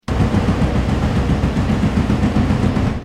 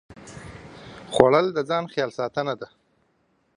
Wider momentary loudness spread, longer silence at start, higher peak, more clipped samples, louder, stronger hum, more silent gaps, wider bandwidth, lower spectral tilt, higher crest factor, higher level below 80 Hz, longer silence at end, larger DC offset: second, 1 LU vs 25 LU; about the same, 0.1 s vs 0.1 s; second, -4 dBFS vs 0 dBFS; neither; first, -17 LUFS vs -23 LUFS; neither; neither; about the same, 11.5 kHz vs 10.5 kHz; first, -7.5 dB/octave vs -5.5 dB/octave; second, 12 dB vs 26 dB; first, -24 dBFS vs -56 dBFS; second, 0 s vs 0.9 s; neither